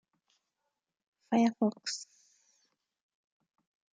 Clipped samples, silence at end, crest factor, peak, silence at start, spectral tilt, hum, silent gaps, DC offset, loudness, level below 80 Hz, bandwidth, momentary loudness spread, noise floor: under 0.1%; 1.95 s; 22 dB; -16 dBFS; 1.3 s; -4.5 dB/octave; none; none; under 0.1%; -32 LUFS; -88 dBFS; 9.4 kHz; 13 LU; -86 dBFS